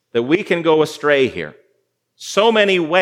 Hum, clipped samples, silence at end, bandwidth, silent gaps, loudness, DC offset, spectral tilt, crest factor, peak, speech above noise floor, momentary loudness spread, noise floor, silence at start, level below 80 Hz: none; under 0.1%; 0 s; 14.5 kHz; none; -16 LUFS; under 0.1%; -4.5 dB/octave; 16 dB; 0 dBFS; 51 dB; 14 LU; -66 dBFS; 0.15 s; -64 dBFS